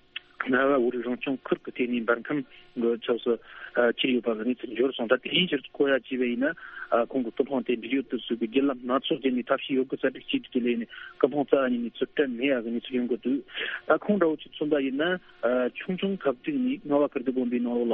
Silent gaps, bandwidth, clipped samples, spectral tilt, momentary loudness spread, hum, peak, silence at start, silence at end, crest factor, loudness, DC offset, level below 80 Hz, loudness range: none; 4 kHz; under 0.1%; -3 dB/octave; 6 LU; none; -4 dBFS; 0.4 s; 0 s; 22 dB; -27 LUFS; under 0.1%; -66 dBFS; 1 LU